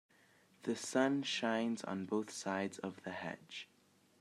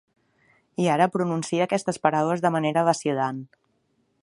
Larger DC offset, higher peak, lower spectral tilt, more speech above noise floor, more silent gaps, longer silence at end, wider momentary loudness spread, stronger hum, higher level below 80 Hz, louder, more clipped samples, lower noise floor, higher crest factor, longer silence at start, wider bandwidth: neither; second, -18 dBFS vs -4 dBFS; second, -4 dB/octave vs -5.5 dB/octave; second, 30 dB vs 46 dB; neither; second, 0.55 s vs 0.75 s; first, 13 LU vs 6 LU; neither; second, -88 dBFS vs -70 dBFS; second, -39 LUFS vs -24 LUFS; neither; about the same, -69 dBFS vs -70 dBFS; about the same, 22 dB vs 22 dB; second, 0.65 s vs 0.8 s; first, 13.5 kHz vs 11.5 kHz